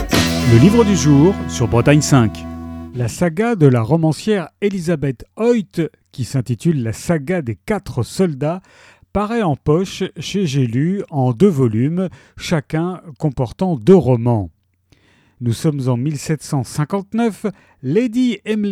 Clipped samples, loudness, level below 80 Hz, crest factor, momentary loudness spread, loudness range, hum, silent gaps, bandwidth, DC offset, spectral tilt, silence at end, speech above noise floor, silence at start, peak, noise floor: under 0.1%; -17 LUFS; -40 dBFS; 16 dB; 12 LU; 6 LU; none; none; 17.5 kHz; under 0.1%; -6.5 dB/octave; 0 s; 41 dB; 0 s; 0 dBFS; -57 dBFS